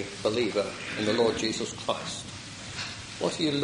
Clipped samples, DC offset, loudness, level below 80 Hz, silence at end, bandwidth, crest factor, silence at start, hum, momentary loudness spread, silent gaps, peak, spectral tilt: under 0.1%; under 0.1%; -30 LUFS; -58 dBFS; 0 s; 11.5 kHz; 18 dB; 0 s; none; 11 LU; none; -12 dBFS; -4 dB/octave